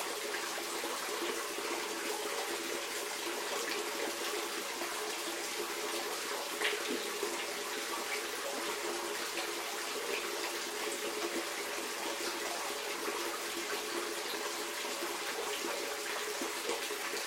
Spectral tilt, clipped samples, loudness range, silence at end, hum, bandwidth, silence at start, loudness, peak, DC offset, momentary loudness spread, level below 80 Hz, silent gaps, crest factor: 0 dB/octave; under 0.1%; 1 LU; 0 s; none; 16.5 kHz; 0 s; -36 LUFS; -20 dBFS; under 0.1%; 1 LU; -76 dBFS; none; 18 dB